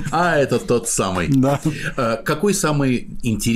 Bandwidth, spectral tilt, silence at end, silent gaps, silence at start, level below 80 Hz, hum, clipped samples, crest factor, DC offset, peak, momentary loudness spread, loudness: 16 kHz; -5 dB/octave; 0 s; none; 0 s; -38 dBFS; none; under 0.1%; 10 dB; under 0.1%; -8 dBFS; 5 LU; -19 LUFS